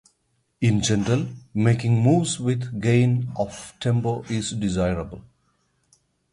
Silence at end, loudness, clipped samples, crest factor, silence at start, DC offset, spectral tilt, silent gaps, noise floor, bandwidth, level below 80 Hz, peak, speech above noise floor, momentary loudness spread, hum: 1.1 s; -23 LUFS; under 0.1%; 18 dB; 0.6 s; under 0.1%; -6 dB/octave; none; -70 dBFS; 11 kHz; -46 dBFS; -6 dBFS; 48 dB; 10 LU; none